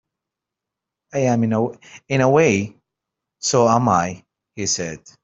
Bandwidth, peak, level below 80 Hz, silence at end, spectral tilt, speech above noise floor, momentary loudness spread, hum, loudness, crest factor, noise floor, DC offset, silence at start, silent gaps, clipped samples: 8.2 kHz; -2 dBFS; -58 dBFS; 0.25 s; -5 dB/octave; 66 dB; 13 LU; none; -19 LUFS; 18 dB; -85 dBFS; under 0.1%; 1.15 s; none; under 0.1%